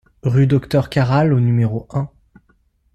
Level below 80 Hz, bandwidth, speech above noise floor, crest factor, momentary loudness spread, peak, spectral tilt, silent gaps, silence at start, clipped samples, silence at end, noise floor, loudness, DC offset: -46 dBFS; 9 kHz; 44 dB; 14 dB; 10 LU; -4 dBFS; -8.5 dB/octave; none; 0.25 s; under 0.1%; 0.9 s; -59 dBFS; -17 LUFS; under 0.1%